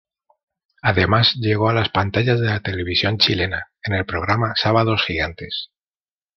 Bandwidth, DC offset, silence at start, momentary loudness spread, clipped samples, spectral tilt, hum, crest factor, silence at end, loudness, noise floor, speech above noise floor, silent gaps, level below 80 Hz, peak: 6.4 kHz; under 0.1%; 0.85 s; 9 LU; under 0.1%; -6.5 dB/octave; none; 18 dB; 0.7 s; -19 LUFS; under -90 dBFS; over 71 dB; none; -48 dBFS; -2 dBFS